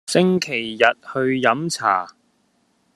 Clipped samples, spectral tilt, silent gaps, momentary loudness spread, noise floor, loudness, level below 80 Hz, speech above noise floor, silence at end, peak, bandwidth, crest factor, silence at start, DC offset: under 0.1%; -4.5 dB/octave; none; 6 LU; -64 dBFS; -19 LUFS; -66 dBFS; 45 dB; 0.85 s; 0 dBFS; 13.5 kHz; 20 dB; 0.1 s; under 0.1%